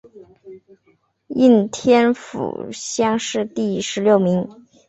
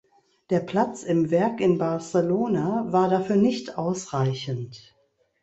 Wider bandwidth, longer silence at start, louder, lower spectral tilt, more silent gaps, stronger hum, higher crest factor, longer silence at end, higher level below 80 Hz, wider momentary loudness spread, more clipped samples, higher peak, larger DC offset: about the same, 8.2 kHz vs 8.2 kHz; second, 0.15 s vs 0.5 s; first, -18 LUFS vs -24 LUFS; second, -5 dB/octave vs -7 dB/octave; neither; neither; about the same, 16 dB vs 16 dB; second, 0.35 s vs 0.65 s; about the same, -60 dBFS vs -62 dBFS; first, 13 LU vs 7 LU; neither; first, -2 dBFS vs -8 dBFS; neither